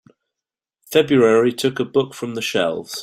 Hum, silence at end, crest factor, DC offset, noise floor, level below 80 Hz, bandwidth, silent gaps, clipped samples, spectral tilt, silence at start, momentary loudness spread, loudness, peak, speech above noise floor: none; 0 s; 18 dB; under 0.1%; -87 dBFS; -62 dBFS; 16 kHz; none; under 0.1%; -5 dB/octave; 0.9 s; 9 LU; -18 LUFS; -2 dBFS; 70 dB